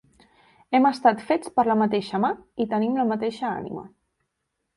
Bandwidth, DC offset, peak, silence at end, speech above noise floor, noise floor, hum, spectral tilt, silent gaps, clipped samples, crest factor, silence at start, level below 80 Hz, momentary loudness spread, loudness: 11.5 kHz; under 0.1%; -6 dBFS; 0.9 s; 56 dB; -79 dBFS; none; -6.5 dB/octave; none; under 0.1%; 20 dB; 0.7 s; -64 dBFS; 9 LU; -23 LUFS